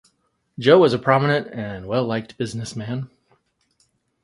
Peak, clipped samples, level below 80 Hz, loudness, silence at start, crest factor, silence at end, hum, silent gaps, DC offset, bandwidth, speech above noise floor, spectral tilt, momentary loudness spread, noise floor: 0 dBFS; under 0.1%; -56 dBFS; -20 LUFS; 0.6 s; 22 dB; 1.2 s; none; none; under 0.1%; 11.5 kHz; 49 dB; -6.5 dB/octave; 16 LU; -68 dBFS